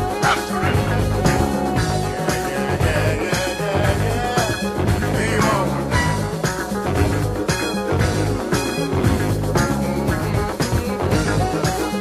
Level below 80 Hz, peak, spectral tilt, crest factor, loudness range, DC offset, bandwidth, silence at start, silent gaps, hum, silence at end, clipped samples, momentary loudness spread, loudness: -30 dBFS; -4 dBFS; -5.5 dB/octave; 16 dB; 1 LU; under 0.1%; 15 kHz; 0 s; none; none; 0 s; under 0.1%; 3 LU; -20 LUFS